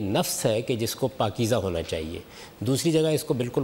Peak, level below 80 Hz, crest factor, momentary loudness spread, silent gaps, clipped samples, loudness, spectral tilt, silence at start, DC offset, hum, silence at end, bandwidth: -10 dBFS; -52 dBFS; 14 dB; 10 LU; none; under 0.1%; -26 LUFS; -5 dB/octave; 0 s; under 0.1%; none; 0 s; 16 kHz